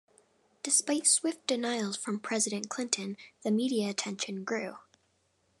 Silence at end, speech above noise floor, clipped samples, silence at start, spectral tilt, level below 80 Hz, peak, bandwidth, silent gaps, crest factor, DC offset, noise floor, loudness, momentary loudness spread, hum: 0.8 s; 41 dB; under 0.1%; 0.65 s; -2.5 dB/octave; under -90 dBFS; -10 dBFS; 13 kHz; none; 22 dB; under 0.1%; -73 dBFS; -30 LUFS; 11 LU; none